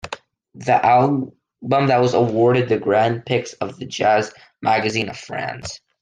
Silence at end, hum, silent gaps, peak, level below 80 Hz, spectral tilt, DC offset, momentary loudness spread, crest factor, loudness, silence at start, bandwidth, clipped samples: 0.25 s; none; none; -4 dBFS; -58 dBFS; -6 dB/octave; under 0.1%; 15 LU; 16 dB; -19 LUFS; 0.05 s; 9.6 kHz; under 0.1%